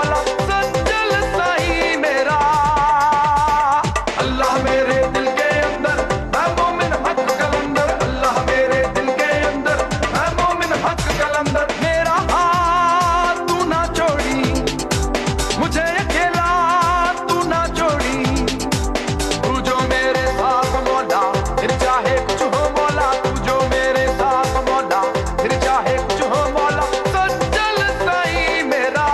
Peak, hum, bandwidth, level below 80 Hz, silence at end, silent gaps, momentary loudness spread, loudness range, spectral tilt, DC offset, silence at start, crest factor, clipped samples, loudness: -2 dBFS; none; 13.5 kHz; -30 dBFS; 0 s; none; 4 LU; 2 LU; -4.5 dB/octave; under 0.1%; 0 s; 14 dB; under 0.1%; -17 LUFS